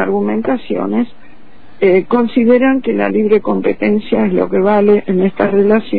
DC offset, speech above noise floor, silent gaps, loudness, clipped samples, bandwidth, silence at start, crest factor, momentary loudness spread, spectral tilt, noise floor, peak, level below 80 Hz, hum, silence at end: 3%; 31 dB; none; -13 LUFS; under 0.1%; 4.8 kHz; 0 s; 12 dB; 6 LU; -11 dB/octave; -43 dBFS; 0 dBFS; -46 dBFS; none; 0 s